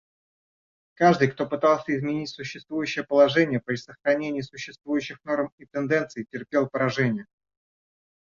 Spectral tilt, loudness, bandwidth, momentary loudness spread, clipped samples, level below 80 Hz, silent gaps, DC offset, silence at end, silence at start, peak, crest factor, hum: -6 dB/octave; -25 LUFS; 7.4 kHz; 13 LU; under 0.1%; -66 dBFS; 5.52-5.58 s; under 0.1%; 1.05 s; 1 s; -6 dBFS; 20 dB; none